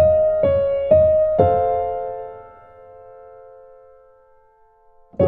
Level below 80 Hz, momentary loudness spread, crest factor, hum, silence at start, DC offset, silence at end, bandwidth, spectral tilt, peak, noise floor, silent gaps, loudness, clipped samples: -46 dBFS; 20 LU; 18 dB; none; 0 s; under 0.1%; 0 s; 4 kHz; -11.5 dB/octave; -2 dBFS; -54 dBFS; none; -17 LUFS; under 0.1%